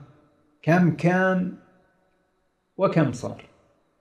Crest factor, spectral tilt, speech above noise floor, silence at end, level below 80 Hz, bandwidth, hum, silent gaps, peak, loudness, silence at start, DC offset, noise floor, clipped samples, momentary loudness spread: 18 dB; -8 dB/octave; 49 dB; 0.6 s; -64 dBFS; 9.4 kHz; none; none; -8 dBFS; -23 LUFS; 0 s; under 0.1%; -70 dBFS; under 0.1%; 16 LU